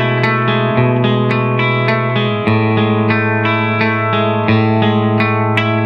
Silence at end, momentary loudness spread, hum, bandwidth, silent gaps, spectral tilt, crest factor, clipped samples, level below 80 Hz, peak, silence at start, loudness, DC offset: 0 s; 1 LU; none; 5.8 kHz; none; -8.5 dB/octave; 14 dB; under 0.1%; -50 dBFS; 0 dBFS; 0 s; -14 LUFS; under 0.1%